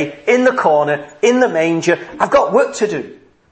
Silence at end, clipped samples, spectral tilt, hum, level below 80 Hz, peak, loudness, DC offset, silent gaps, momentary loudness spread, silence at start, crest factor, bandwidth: 0.35 s; under 0.1%; -4.5 dB/octave; none; -54 dBFS; 0 dBFS; -14 LUFS; under 0.1%; none; 7 LU; 0 s; 14 dB; 8.8 kHz